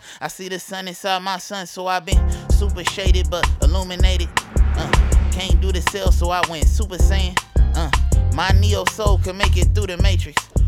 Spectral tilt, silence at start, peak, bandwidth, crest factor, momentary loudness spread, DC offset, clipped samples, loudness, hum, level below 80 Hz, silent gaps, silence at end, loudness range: -4.5 dB/octave; 0.05 s; -2 dBFS; 15 kHz; 16 dB; 9 LU; under 0.1%; under 0.1%; -19 LUFS; none; -18 dBFS; none; 0 s; 2 LU